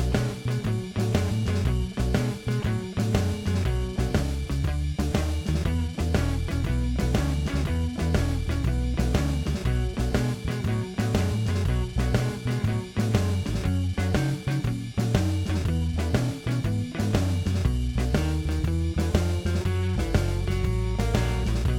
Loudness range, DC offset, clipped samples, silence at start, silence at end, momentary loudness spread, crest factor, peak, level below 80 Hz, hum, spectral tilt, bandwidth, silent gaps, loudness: 1 LU; under 0.1%; under 0.1%; 0 s; 0 s; 3 LU; 18 dB; -8 dBFS; -30 dBFS; none; -6.5 dB/octave; 16.5 kHz; none; -27 LUFS